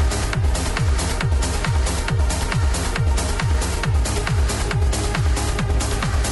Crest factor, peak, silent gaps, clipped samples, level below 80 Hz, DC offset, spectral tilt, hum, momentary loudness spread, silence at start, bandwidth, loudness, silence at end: 12 dB; -8 dBFS; none; under 0.1%; -22 dBFS; under 0.1%; -4.5 dB/octave; none; 1 LU; 0 s; 12 kHz; -21 LUFS; 0 s